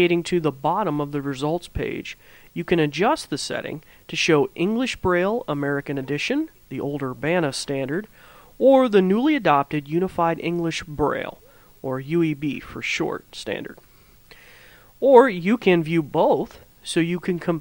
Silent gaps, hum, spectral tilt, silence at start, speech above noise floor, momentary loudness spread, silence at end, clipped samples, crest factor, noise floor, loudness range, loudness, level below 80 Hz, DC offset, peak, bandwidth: none; none; -5.5 dB/octave; 0 s; 29 dB; 13 LU; 0 s; under 0.1%; 22 dB; -50 dBFS; 6 LU; -22 LUFS; -50 dBFS; under 0.1%; 0 dBFS; 16.5 kHz